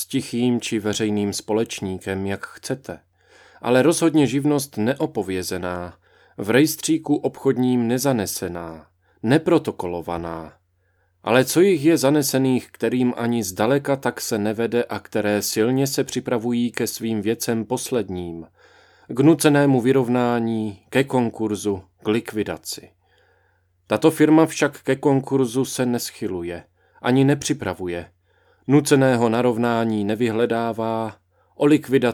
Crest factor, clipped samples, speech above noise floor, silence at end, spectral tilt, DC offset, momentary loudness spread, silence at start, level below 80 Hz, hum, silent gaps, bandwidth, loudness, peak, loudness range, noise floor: 20 dB; under 0.1%; 45 dB; 0 s; -5.5 dB/octave; under 0.1%; 13 LU; 0 s; -60 dBFS; none; none; 19.5 kHz; -21 LUFS; -2 dBFS; 4 LU; -65 dBFS